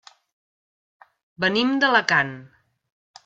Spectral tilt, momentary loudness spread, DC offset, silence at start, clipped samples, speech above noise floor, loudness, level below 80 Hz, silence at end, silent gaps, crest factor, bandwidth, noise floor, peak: -4.5 dB/octave; 10 LU; under 0.1%; 1.4 s; under 0.1%; over 69 dB; -20 LUFS; -68 dBFS; 0.8 s; none; 24 dB; 7.8 kHz; under -90 dBFS; -2 dBFS